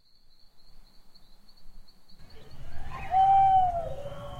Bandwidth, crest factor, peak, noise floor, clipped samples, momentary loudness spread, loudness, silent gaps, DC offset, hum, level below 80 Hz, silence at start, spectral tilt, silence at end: 7.2 kHz; 16 dB; -14 dBFS; -53 dBFS; under 0.1%; 24 LU; -24 LUFS; none; under 0.1%; none; -46 dBFS; 0.45 s; -6 dB/octave; 0 s